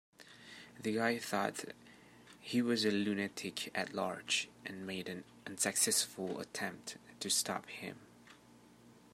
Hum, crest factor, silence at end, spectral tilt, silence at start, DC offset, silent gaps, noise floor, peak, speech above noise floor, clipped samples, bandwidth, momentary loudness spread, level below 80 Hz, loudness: none; 22 dB; 0.15 s; -2.5 dB/octave; 0.2 s; under 0.1%; none; -62 dBFS; -16 dBFS; 24 dB; under 0.1%; 16 kHz; 18 LU; -80 dBFS; -36 LUFS